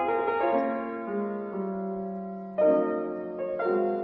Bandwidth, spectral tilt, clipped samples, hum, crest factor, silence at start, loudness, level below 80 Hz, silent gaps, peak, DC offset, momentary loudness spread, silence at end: 5.4 kHz; -10.5 dB/octave; under 0.1%; none; 16 dB; 0 s; -29 LUFS; -68 dBFS; none; -12 dBFS; under 0.1%; 10 LU; 0 s